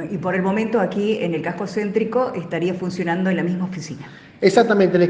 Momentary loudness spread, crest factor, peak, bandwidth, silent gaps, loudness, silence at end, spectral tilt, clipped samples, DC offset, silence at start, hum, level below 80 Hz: 11 LU; 20 dB; 0 dBFS; 9.4 kHz; none; -20 LUFS; 0 s; -6.5 dB/octave; under 0.1%; under 0.1%; 0 s; none; -60 dBFS